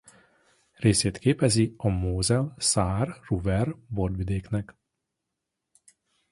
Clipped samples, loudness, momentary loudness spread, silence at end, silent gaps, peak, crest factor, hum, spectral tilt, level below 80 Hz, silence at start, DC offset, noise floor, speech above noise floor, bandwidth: under 0.1%; -26 LUFS; 8 LU; 1.6 s; none; -6 dBFS; 20 dB; none; -5 dB/octave; -42 dBFS; 0.8 s; under 0.1%; -84 dBFS; 59 dB; 11.5 kHz